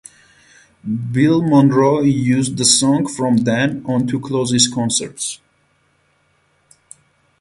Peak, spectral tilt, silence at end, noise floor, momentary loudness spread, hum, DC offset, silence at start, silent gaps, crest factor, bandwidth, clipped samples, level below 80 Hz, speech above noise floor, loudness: 0 dBFS; -4.5 dB/octave; 2.05 s; -60 dBFS; 12 LU; none; under 0.1%; 0.85 s; none; 18 dB; 11.5 kHz; under 0.1%; -54 dBFS; 45 dB; -16 LUFS